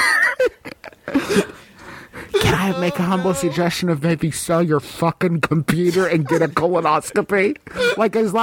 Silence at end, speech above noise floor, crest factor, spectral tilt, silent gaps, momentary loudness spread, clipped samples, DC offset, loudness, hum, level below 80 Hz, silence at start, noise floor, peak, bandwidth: 0 s; 21 dB; 16 dB; -5.5 dB/octave; none; 7 LU; under 0.1%; under 0.1%; -19 LUFS; none; -46 dBFS; 0 s; -39 dBFS; -2 dBFS; 17 kHz